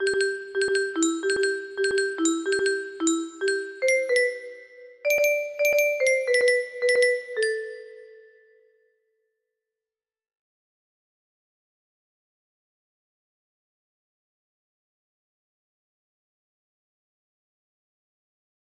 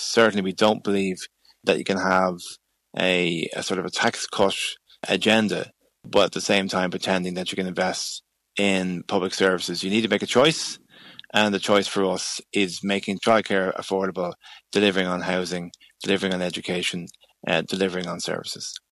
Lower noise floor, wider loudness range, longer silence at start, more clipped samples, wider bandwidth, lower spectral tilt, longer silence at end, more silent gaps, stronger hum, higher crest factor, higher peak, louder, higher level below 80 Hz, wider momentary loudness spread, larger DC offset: first, under -90 dBFS vs -47 dBFS; first, 6 LU vs 3 LU; about the same, 0 s vs 0 s; neither; about the same, 13 kHz vs 13.5 kHz; second, -1 dB/octave vs -4 dB/octave; first, 10.65 s vs 0.15 s; neither; neither; about the same, 18 dB vs 18 dB; second, -10 dBFS vs -6 dBFS; about the same, -24 LUFS vs -23 LUFS; second, -72 dBFS vs -66 dBFS; second, 6 LU vs 12 LU; neither